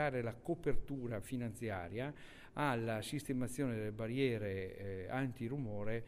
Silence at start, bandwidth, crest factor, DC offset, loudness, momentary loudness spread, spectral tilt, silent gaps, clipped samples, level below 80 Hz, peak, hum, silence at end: 0 s; 15.5 kHz; 16 dB; under 0.1%; -41 LUFS; 7 LU; -6.5 dB/octave; none; under 0.1%; -52 dBFS; -22 dBFS; none; 0 s